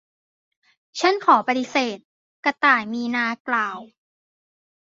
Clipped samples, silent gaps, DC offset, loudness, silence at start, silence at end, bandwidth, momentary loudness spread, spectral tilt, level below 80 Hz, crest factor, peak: under 0.1%; 2.05-2.43 s, 3.40-3.45 s; under 0.1%; -21 LUFS; 0.95 s; 1 s; 7.8 kHz; 11 LU; -3 dB/octave; -74 dBFS; 20 dB; -4 dBFS